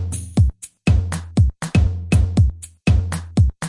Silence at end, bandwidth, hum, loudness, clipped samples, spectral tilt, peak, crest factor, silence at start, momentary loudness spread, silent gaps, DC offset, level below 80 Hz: 0 s; 11.5 kHz; none; -19 LUFS; under 0.1%; -6.5 dB/octave; -4 dBFS; 12 dB; 0 s; 5 LU; none; under 0.1%; -24 dBFS